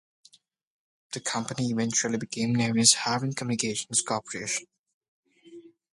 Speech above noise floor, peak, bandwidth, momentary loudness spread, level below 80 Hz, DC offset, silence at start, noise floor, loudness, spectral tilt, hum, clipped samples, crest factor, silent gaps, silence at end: 33 dB; -4 dBFS; 11.5 kHz; 12 LU; -68 dBFS; under 0.1%; 1.1 s; -60 dBFS; -26 LUFS; -3 dB/octave; none; under 0.1%; 24 dB; 4.79-4.84 s, 4.94-5.01 s, 5.08-5.23 s; 0.25 s